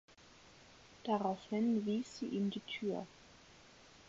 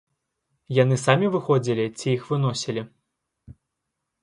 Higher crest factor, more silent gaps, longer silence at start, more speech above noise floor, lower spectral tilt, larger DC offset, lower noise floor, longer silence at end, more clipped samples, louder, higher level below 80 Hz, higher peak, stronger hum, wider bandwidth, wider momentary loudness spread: about the same, 20 dB vs 22 dB; neither; second, 0.2 s vs 0.7 s; second, 24 dB vs 59 dB; about the same, -5 dB/octave vs -6 dB/octave; neither; second, -62 dBFS vs -81 dBFS; second, 0.05 s vs 0.7 s; neither; second, -39 LUFS vs -23 LUFS; second, -74 dBFS vs -62 dBFS; second, -20 dBFS vs -4 dBFS; neither; second, 7.6 kHz vs 11.5 kHz; first, 25 LU vs 10 LU